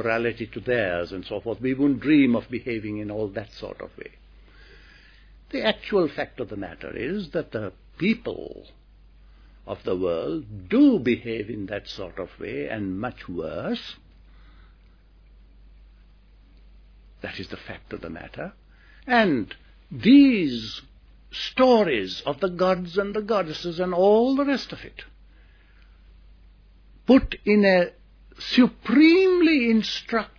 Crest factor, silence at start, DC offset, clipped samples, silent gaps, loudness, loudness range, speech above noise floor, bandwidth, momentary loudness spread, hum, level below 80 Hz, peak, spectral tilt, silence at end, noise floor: 20 dB; 0 s; under 0.1%; under 0.1%; none; -23 LUFS; 14 LU; 30 dB; 5.4 kHz; 19 LU; none; -50 dBFS; -4 dBFS; -6.5 dB/octave; 0.1 s; -53 dBFS